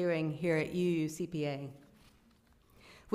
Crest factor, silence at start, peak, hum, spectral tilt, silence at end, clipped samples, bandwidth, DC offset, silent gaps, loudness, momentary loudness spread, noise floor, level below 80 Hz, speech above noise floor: 20 dB; 0 s; -16 dBFS; none; -6.5 dB/octave; 0 s; under 0.1%; 15.5 kHz; under 0.1%; none; -34 LUFS; 8 LU; -66 dBFS; -68 dBFS; 32 dB